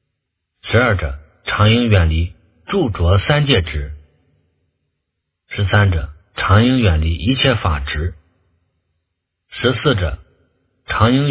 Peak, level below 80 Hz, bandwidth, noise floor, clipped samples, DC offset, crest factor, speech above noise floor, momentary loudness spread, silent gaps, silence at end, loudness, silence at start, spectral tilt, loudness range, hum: 0 dBFS; -26 dBFS; 4 kHz; -76 dBFS; under 0.1%; under 0.1%; 18 dB; 61 dB; 14 LU; none; 0 s; -16 LUFS; 0.65 s; -10.5 dB/octave; 4 LU; none